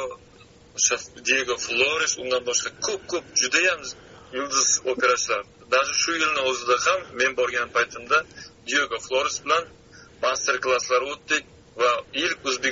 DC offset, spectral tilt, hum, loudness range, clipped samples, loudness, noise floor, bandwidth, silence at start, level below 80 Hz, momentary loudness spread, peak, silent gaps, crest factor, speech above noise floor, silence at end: under 0.1%; 1 dB/octave; none; 3 LU; under 0.1%; -23 LUFS; -51 dBFS; 7.6 kHz; 0 s; -60 dBFS; 8 LU; -6 dBFS; none; 20 dB; 27 dB; 0 s